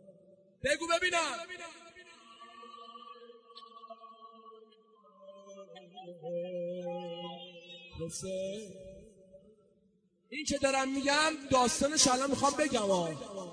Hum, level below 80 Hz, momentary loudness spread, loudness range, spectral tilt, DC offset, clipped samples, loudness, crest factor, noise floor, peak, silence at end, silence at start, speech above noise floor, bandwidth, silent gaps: none; -64 dBFS; 25 LU; 23 LU; -2.5 dB/octave; under 0.1%; under 0.1%; -31 LUFS; 24 dB; -71 dBFS; -12 dBFS; 0 s; 0.05 s; 39 dB; 10.5 kHz; none